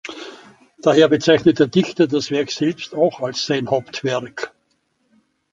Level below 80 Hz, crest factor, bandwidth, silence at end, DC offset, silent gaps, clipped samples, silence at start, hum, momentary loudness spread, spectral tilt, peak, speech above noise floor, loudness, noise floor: -58 dBFS; 18 dB; 7.8 kHz; 1.05 s; under 0.1%; none; under 0.1%; 0.05 s; none; 17 LU; -5.5 dB/octave; -2 dBFS; 49 dB; -18 LUFS; -66 dBFS